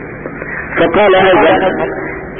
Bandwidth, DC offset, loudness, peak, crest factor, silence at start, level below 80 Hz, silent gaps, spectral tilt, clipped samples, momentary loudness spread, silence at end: 3.7 kHz; under 0.1%; -10 LUFS; -2 dBFS; 10 dB; 0 s; -38 dBFS; none; -11 dB/octave; under 0.1%; 15 LU; 0 s